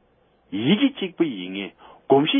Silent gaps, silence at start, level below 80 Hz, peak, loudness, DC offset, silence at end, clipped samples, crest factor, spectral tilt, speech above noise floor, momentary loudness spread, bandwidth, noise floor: none; 0.5 s; -68 dBFS; -4 dBFS; -23 LUFS; under 0.1%; 0 s; under 0.1%; 18 dB; -10.5 dB/octave; 40 dB; 13 LU; 3.7 kHz; -61 dBFS